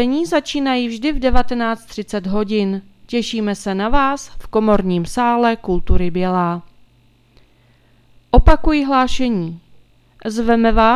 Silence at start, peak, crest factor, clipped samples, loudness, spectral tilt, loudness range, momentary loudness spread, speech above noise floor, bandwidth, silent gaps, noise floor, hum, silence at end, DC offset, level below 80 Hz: 0 s; 0 dBFS; 16 dB; 0.1%; -18 LUFS; -6 dB/octave; 3 LU; 10 LU; 38 dB; 12 kHz; none; -53 dBFS; none; 0 s; under 0.1%; -24 dBFS